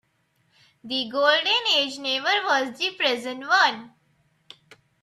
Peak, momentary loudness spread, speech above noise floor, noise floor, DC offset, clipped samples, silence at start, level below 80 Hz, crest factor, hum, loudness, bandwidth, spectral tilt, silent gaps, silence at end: -6 dBFS; 9 LU; 45 dB; -68 dBFS; under 0.1%; under 0.1%; 0.85 s; -78 dBFS; 20 dB; none; -22 LUFS; 13.5 kHz; -1 dB/octave; none; 1.15 s